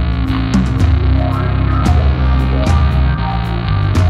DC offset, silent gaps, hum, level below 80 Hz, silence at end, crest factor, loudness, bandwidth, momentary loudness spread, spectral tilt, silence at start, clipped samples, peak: under 0.1%; none; none; -16 dBFS; 0 s; 12 dB; -14 LUFS; 8.4 kHz; 4 LU; -7.5 dB/octave; 0 s; under 0.1%; -2 dBFS